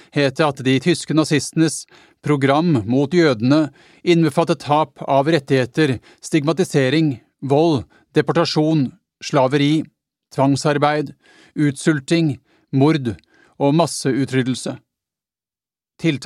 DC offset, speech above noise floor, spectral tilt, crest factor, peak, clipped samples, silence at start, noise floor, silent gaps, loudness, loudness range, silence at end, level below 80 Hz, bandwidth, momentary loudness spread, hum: under 0.1%; over 73 dB; -6 dB/octave; 18 dB; 0 dBFS; under 0.1%; 0.15 s; under -90 dBFS; none; -18 LUFS; 3 LU; 0 s; -60 dBFS; 13.5 kHz; 10 LU; none